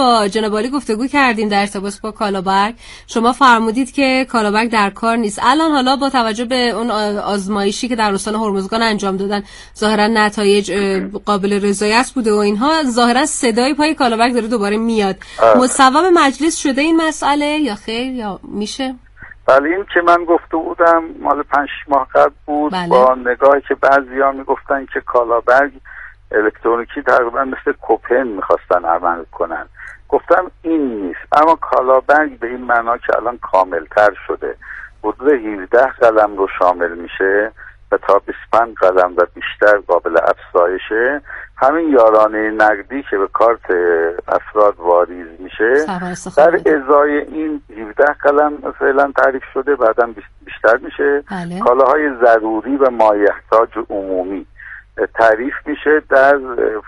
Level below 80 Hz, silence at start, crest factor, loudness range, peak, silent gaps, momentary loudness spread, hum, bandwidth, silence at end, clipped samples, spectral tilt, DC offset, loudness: -44 dBFS; 0 s; 14 dB; 3 LU; 0 dBFS; none; 10 LU; none; 11.5 kHz; 0.05 s; under 0.1%; -4 dB/octave; under 0.1%; -14 LUFS